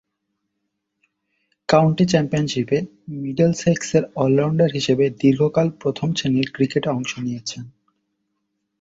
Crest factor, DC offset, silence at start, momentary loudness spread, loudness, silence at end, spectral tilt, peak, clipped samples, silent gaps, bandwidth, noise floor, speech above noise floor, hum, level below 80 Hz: 20 dB; under 0.1%; 1.7 s; 10 LU; -20 LUFS; 1.1 s; -6 dB/octave; -2 dBFS; under 0.1%; none; 7.8 kHz; -76 dBFS; 57 dB; none; -56 dBFS